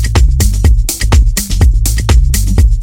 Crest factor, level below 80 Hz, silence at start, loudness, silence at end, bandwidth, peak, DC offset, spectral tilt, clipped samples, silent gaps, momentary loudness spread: 8 dB; -10 dBFS; 0 s; -11 LUFS; 0 s; 17 kHz; 0 dBFS; under 0.1%; -4.5 dB/octave; under 0.1%; none; 2 LU